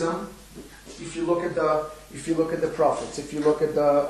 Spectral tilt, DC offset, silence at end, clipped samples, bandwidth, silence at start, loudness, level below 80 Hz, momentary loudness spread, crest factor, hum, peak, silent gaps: -5.5 dB/octave; under 0.1%; 0 s; under 0.1%; 13.5 kHz; 0 s; -25 LUFS; -52 dBFS; 19 LU; 18 dB; none; -8 dBFS; none